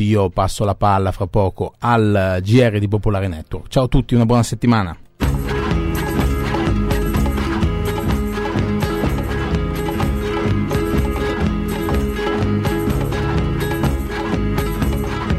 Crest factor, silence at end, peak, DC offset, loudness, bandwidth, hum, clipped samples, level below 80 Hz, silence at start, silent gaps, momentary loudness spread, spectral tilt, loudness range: 14 dB; 0 s; -4 dBFS; under 0.1%; -19 LUFS; 15 kHz; none; under 0.1%; -26 dBFS; 0 s; none; 6 LU; -7 dB/octave; 3 LU